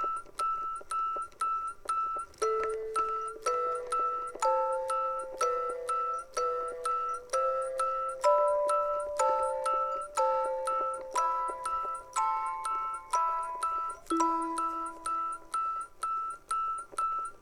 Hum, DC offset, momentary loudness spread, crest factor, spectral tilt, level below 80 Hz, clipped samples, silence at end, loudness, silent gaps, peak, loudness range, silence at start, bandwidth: none; under 0.1%; 6 LU; 18 dB; -2.5 dB/octave; -62 dBFS; under 0.1%; 0.05 s; -31 LUFS; none; -14 dBFS; 3 LU; 0 s; 15.5 kHz